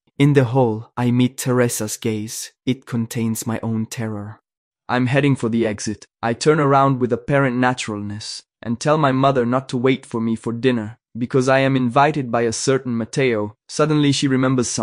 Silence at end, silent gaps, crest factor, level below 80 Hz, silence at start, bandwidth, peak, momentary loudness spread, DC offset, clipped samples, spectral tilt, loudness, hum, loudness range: 0 s; 4.57-4.71 s; 18 dB; -56 dBFS; 0.2 s; 16 kHz; 0 dBFS; 11 LU; under 0.1%; under 0.1%; -5.5 dB/octave; -19 LUFS; none; 4 LU